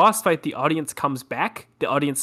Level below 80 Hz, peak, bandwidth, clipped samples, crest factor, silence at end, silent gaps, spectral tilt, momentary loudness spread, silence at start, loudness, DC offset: -68 dBFS; -6 dBFS; 16.5 kHz; under 0.1%; 16 dB; 0 s; none; -4 dB/octave; 5 LU; 0 s; -24 LUFS; under 0.1%